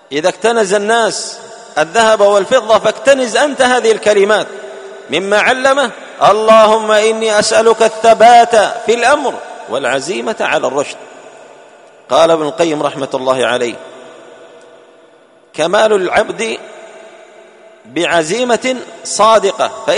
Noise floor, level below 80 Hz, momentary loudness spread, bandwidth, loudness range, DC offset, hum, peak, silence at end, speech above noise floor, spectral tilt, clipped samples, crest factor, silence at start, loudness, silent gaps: -45 dBFS; -56 dBFS; 13 LU; 11 kHz; 8 LU; under 0.1%; none; 0 dBFS; 0 s; 34 dB; -2.5 dB/octave; 0.3%; 12 dB; 0.1 s; -11 LUFS; none